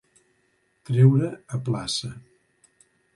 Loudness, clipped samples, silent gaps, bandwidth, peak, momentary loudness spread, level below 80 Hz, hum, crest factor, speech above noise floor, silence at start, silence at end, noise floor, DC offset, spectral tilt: -23 LUFS; under 0.1%; none; 11.5 kHz; -6 dBFS; 13 LU; -60 dBFS; none; 20 dB; 46 dB; 0.9 s; 0.95 s; -68 dBFS; under 0.1%; -6.5 dB/octave